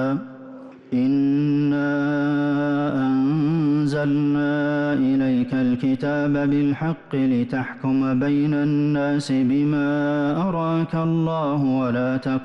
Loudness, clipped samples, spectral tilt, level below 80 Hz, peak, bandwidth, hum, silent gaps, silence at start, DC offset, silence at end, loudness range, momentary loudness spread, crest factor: -21 LUFS; under 0.1%; -8.5 dB/octave; -56 dBFS; -14 dBFS; 8.8 kHz; none; none; 0 s; under 0.1%; 0 s; 1 LU; 3 LU; 8 dB